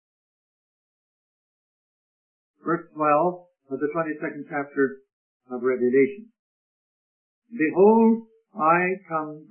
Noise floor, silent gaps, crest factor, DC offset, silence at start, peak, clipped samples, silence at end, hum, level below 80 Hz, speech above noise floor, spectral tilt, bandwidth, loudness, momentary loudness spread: under -90 dBFS; 5.13-5.40 s, 6.39-7.42 s; 20 dB; under 0.1%; 2.65 s; -6 dBFS; under 0.1%; 0.1 s; none; -78 dBFS; over 68 dB; -12.5 dB/octave; 3.2 kHz; -23 LUFS; 18 LU